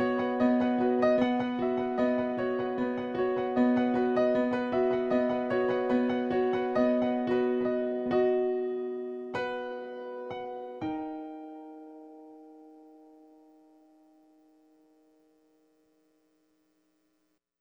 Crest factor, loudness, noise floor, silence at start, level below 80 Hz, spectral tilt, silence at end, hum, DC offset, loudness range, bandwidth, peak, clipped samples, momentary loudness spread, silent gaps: 16 dB; -29 LUFS; -76 dBFS; 0 s; -66 dBFS; -7.5 dB/octave; 4.7 s; none; under 0.1%; 14 LU; 6.2 kHz; -14 dBFS; under 0.1%; 14 LU; none